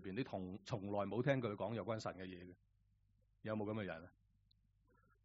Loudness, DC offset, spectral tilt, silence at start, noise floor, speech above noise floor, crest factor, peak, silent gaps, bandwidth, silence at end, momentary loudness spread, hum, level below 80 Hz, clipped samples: -44 LUFS; under 0.1%; -6 dB/octave; 0 s; -77 dBFS; 33 dB; 22 dB; -22 dBFS; none; 6.2 kHz; 1.15 s; 15 LU; none; -76 dBFS; under 0.1%